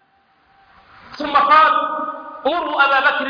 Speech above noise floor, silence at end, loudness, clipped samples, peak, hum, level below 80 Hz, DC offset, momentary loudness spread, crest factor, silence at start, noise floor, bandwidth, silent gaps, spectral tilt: 42 dB; 0 s; -15 LUFS; under 0.1%; -2 dBFS; none; -56 dBFS; under 0.1%; 14 LU; 16 dB; 1.1 s; -58 dBFS; 5.2 kHz; none; -4 dB/octave